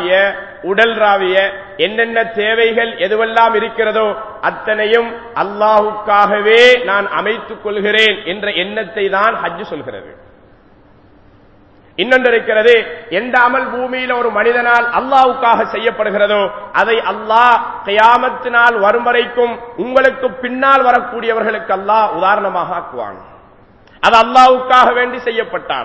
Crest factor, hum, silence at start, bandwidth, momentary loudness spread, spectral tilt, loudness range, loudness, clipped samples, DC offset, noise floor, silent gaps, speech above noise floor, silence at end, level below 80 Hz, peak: 14 dB; none; 0 s; 8 kHz; 10 LU; -4 dB/octave; 4 LU; -12 LUFS; 0.3%; 0.2%; -45 dBFS; none; 33 dB; 0 s; -52 dBFS; 0 dBFS